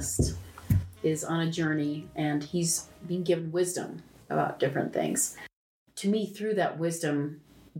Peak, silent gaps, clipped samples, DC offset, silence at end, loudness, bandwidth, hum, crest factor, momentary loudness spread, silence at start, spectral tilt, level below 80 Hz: -12 dBFS; 5.56-5.86 s; under 0.1%; under 0.1%; 0 s; -30 LUFS; 17 kHz; none; 18 dB; 9 LU; 0 s; -5 dB/octave; -48 dBFS